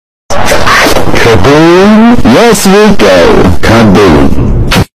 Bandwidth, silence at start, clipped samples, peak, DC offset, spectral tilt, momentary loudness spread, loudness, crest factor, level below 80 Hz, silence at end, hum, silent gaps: 16 kHz; 0.3 s; 4%; 0 dBFS; 30%; -5 dB/octave; 6 LU; -4 LUFS; 4 dB; -18 dBFS; 0 s; none; none